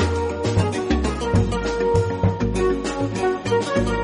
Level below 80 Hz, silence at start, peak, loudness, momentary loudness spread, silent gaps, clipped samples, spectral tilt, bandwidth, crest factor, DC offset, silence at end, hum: -32 dBFS; 0 s; -6 dBFS; -22 LUFS; 3 LU; none; under 0.1%; -6.5 dB/octave; 10.5 kHz; 14 dB; under 0.1%; 0 s; none